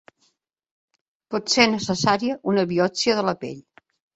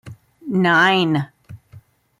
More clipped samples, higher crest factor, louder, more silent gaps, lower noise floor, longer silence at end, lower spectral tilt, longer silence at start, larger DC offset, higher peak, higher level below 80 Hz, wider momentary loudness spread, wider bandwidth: neither; first, 22 dB vs 16 dB; second, -21 LUFS vs -17 LUFS; neither; first, -68 dBFS vs -47 dBFS; first, 0.55 s vs 0.4 s; second, -4 dB/octave vs -6 dB/octave; first, 1.3 s vs 0.05 s; neither; about the same, -2 dBFS vs -4 dBFS; about the same, -60 dBFS vs -62 dBFS; second, 13 LU vs 19 LU; second, 8.2 kHz vs 12.5 kHz